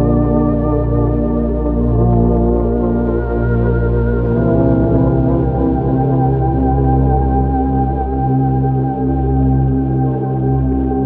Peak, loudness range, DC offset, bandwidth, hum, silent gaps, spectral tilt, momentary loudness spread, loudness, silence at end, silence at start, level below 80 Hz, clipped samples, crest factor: -2 dBFS; 1 LU; under 0.1%; 3.1 kHz; none; none; -13.5 dB/octave; 4 LU; -15 LUFS; 0 s; 0 s; -20 dBFS; under 0.1%; 12 dB